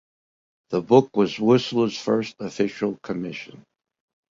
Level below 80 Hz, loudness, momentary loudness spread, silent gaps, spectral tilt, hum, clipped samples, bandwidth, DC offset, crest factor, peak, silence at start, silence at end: -62 dBFS; -22 LUFS; 14 LU; none; -6.5 dB/octave; none; under 0.1%; 7.6 kHz; under 0.1%; 22 dB; -2 dBFS; 0.7 s; 0.75 s